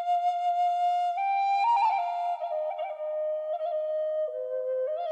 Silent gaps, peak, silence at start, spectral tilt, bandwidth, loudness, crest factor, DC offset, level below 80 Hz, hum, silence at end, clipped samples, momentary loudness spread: none; -16 dBFS; 0 s; 1.5 dB/octave; 8.4 kHz; -28 LUFS; 12 dB; under 0.1%; under -90 dBFS; none; 0 s; under 0.1%; 7 LU